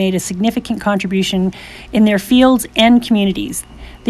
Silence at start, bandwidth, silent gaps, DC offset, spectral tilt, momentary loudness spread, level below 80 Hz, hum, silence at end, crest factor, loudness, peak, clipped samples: 0 s; 14.5 kHz; none; under 0.1%; -5 dB/octave; 10 LU; -40 dBFS; none; 0 s; 14 dB; -14 LUFS; 0 dBFS; under 0.1%